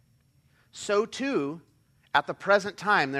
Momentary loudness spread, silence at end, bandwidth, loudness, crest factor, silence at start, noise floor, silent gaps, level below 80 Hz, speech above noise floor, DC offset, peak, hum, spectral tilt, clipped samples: 14 LU; 0 s; 13 kHz; -27 LUFS; 22 dB; 0.75 s; -64 dBFS; none; -70 dBFS; 38 dB; under 0.1%; -8 dBFS; none; -4 dB/octave; under 0.1%